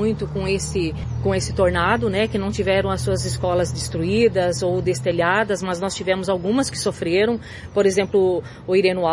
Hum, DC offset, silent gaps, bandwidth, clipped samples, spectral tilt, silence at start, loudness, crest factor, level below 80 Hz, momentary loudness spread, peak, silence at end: none; under 0.1%; none; 11.5 kHz; under 0.1%; -5 dB/octave; 0 s; -21 LUFS; 18 dB; -40 dBFS; 6 LU; -2 dBFS; 0 s